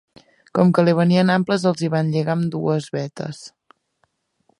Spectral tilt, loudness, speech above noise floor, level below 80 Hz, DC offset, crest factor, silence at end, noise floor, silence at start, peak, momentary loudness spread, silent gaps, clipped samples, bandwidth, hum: -7 dB/octave; -19 LUFS; 50 dB; -64 dBFS; under 0.1%; 18 dB; 1.1 s; -68 dBFS; 0.55 s; -2 dBFS; 13 LU; none; under 0.1%; 11 kHz; none